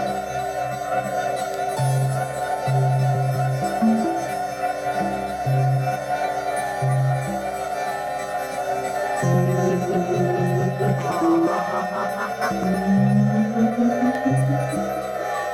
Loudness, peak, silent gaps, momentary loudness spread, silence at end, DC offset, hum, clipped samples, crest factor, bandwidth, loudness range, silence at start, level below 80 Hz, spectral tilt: -22 LUFS; -8 dBFS; none; 7 LU; 0 s; under 0.1%; none; under 0.1%; 14 dB; 14.5 kHz; 3 LU; 0 s; -52 dBFS; -7 dB/octave